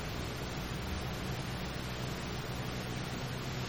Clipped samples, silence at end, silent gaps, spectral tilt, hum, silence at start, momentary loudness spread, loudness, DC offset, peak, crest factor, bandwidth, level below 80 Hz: under 0.1%; 0 s; none; -5 dB/octave; none; 0 s; 1 LU; -39 LUFS; under 0.1%; -26 dBFS; 14 dB; 19 kHz; -48 dBFS